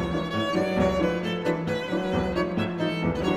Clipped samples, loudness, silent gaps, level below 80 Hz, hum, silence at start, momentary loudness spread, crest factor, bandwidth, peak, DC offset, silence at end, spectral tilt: under 0.1%; -26 LUFS; none; -44 dBFS; none; 0 s; 4 LU; 14 dB; 14 kHz; -10 dBFS; under 0.1%; 0 s; -6.5 dB/octave